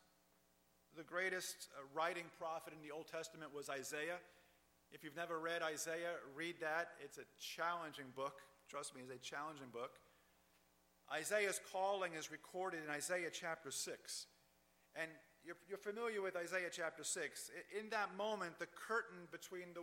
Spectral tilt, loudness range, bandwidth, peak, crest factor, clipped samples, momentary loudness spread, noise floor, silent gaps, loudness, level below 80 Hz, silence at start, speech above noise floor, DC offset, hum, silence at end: -2 dB/octave; 5 LU; 16.5 kHz; -26 dBFS; 22 dB; under 0.1%; 11 LU; -77 dBFS; none; -46 LUFS; -88 dBFS; 0.95 s; 30 dB; under 0.1%; none; 0 s